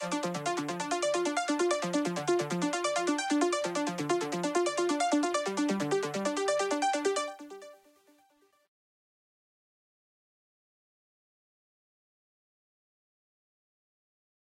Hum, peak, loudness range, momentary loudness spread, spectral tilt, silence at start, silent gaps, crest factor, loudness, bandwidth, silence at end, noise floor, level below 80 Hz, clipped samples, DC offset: none; -14 dBFS; 5 LU; 5 LU; -4 dB/octave; 0 s; none; 18 dB; -30 LUFS; 15 kHz; 6.8 s; -68 dBFS; -82 dBFS; under 0.1%; under 0.1%